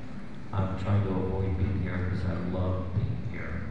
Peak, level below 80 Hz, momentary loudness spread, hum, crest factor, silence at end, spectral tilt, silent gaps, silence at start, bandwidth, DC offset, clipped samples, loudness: -16 dBFS; -44 dBFS; 7 LU; none; 14 dB; 0 s; -9.5 dB/octave; none; 0 s; 5.8 kHz; 1%; under 0.1%; -31 LUFS